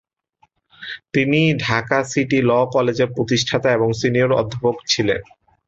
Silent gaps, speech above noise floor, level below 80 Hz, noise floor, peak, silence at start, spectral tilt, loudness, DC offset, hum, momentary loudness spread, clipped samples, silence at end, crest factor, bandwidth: none; 43 dB; -50 dBFS; -61 dBFS; -2 dBFS; 0.8 s; -5 dB/octave; -18 LUFS; under 0.1%; none; 6 LU; under 0.1%; 0.45 s; 18 dB; 8.2 kHz